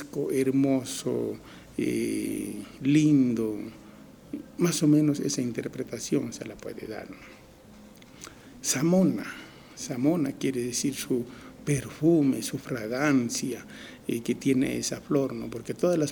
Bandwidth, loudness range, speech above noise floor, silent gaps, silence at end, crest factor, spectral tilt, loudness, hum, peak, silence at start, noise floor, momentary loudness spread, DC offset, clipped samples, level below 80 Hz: 20 kHz; 4 LU; 24 dB; none; 0 s; 16 dB; -5.5 dB/octave; -27 LUFS; none; -10 dBFS; 0 s; -51 dBFS; 17 LU; under 0.1%; under 0.1%; -60 dBFS